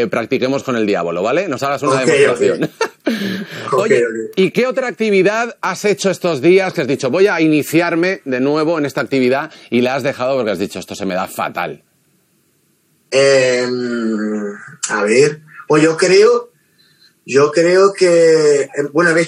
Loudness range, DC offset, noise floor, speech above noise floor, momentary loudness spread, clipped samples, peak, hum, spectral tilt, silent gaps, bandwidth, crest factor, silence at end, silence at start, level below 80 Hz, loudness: 5 LU; under 0.1%; -59 dBFS; 45 dB; 10 LU; under 0.1%; 0 dBFS; none; -4.5 dB/octave; none; 16 kHz; 14 dB; 0 s; 0 s; -68 dBFS; -15 LUFS